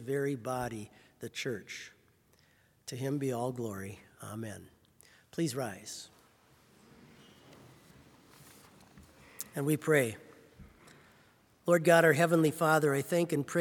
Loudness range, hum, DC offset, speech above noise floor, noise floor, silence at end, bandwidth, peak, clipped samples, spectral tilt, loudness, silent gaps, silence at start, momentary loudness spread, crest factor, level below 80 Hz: 14 LU; none; under 0.1%; 36 dB; -67 dBFS; 0 s; 18 kHz; -10 dBFS; under 0.1%; -5.5 dB/octave; -31 LUFS; none; 0 s; 21 LU; 24 dB; -72 dBFS